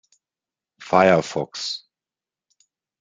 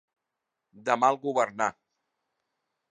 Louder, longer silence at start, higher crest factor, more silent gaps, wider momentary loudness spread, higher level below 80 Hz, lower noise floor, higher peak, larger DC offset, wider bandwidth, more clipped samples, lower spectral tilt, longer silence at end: first, -20 LUFS vs -27 LUFS; about the same, 0.8 s vs 0.75 s; about the same, 22 dB vs 22 dB; neither; first, 13 LU vs 7 LU; first, -64 dBFS vs -78 dBFS; first, under -90 dBFS vs -85 dBFS; first, -2 dBFS vs -8 dBFS; neither; about the same, 9.4 kHz vs 10 kHz; neither; about the same, -5 dB/octave vs -4 dB/octave; about the same, 1.25 s vs 1.2 s